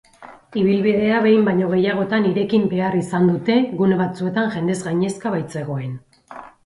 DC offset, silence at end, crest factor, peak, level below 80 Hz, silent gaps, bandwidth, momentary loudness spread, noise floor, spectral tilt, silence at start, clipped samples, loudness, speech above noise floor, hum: under 0.1%; 0.15 s; 16 dB; -4 dBFS; -58 dBFS; none; 11.5 kHz; 11 LU; -43 dBFS; -7 dB/octave; 0.2 s; under 0.1%; -19 LUFS; 25 dB; none